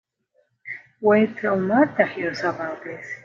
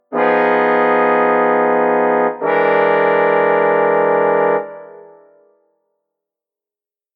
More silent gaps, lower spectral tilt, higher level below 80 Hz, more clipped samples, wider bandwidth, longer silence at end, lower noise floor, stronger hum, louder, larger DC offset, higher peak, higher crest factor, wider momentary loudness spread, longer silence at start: neither; second, -7 dB/octave vs -8.5 dB/octave; first, -66 dBFS vs -76 dBFS; neither; first, 7.4 kHz vs 4.9 kHz; second, 0.1 s vs 2.15 s; second, -67 dBFS vs under -90 dBFS; neither; second, -21 LUFS vs -14 LUFS; neither; about the same, -2 dBFS vs -2 dBFS; first, 20 dB vs 14 dB; first, 18 LU vs 3 LU; first, 0.65 s vs 0.1 s